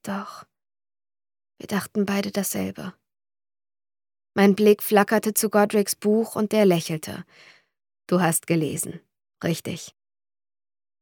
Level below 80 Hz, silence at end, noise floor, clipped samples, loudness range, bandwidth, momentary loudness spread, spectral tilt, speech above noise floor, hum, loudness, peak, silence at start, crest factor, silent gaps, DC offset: -70 dBFS; 1.1 s; under -90 dBFS; under 0.1%; 9 LU; 19 kHz; 15 LU; -5 dB/octave; over 68 dB; none; -23 LUFS; -4 dBFS; 0.05 s; 22 dB; none; under 0.1%